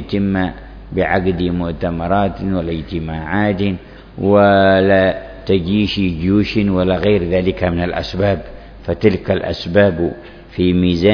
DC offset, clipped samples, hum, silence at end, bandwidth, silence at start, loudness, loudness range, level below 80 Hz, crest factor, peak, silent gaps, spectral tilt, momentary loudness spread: under 0.1%; under 0.1%; none; 0 s; 5.4 kHz; 0 s; -16 LUFS; 5 LU; -34 dBFS; 16 dB; 0 dBFS; none; -8.5 dB/octave; 12 LU